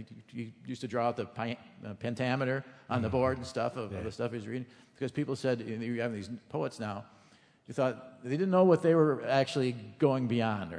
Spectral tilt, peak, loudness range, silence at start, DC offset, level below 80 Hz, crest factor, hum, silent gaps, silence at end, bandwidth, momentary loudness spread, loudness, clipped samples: -7 dB/octave; -12 dBFS; 7 LU; 0 s; under 0.1%; -66 dBFS; 20 dB; none; none; 0 s; 10.5 kHz; 16 LU; -32 LUFS; under 0.1%